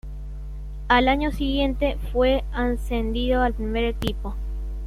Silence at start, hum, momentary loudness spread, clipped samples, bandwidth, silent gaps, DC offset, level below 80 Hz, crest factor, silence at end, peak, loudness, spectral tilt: 0.05 s; 50 Hz at -30 dBFS; 17 LU; under 0.1%; 13.5 kHz; none; under 0.1%; -28 dBFS; 20 dB; 0 s; -4 dBFS; -24 LUFS; -6.5 dB/octave